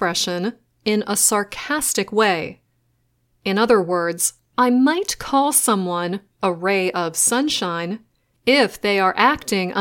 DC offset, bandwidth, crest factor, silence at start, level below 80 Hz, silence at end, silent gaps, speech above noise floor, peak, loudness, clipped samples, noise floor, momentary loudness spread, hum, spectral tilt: under 0.1%; 17 kHz; 20 dB; 0 s; -56 dBFS; 0 s; none; 46 dB; 0 dBFS; -19 LUFS; under 0.1%; -66 dBFS; 9 LU; none; -3 dB/octave